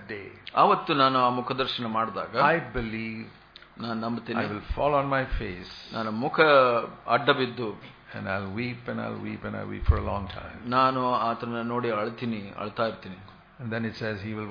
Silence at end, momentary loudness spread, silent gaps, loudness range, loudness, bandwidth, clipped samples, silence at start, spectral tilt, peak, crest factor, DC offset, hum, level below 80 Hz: 0 s; 16 LU; none; 6 LU; -27 LUFS; 5.2 kHz; under 0.1%; 0 s; -7.5 dB/octave; -4 dBFS; 22 dB; under 0.1%; none; -40 dBFS